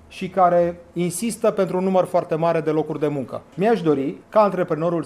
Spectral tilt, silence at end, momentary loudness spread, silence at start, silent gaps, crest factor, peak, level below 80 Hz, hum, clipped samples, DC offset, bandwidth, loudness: -6.5 dB/octave; 0 s; 7 LU; 0.1 s; none; 16 dB; -4 dBFS; -58 dBFS; none; under 0.1%; under 0.1%; 15 kHz; -21 LUFS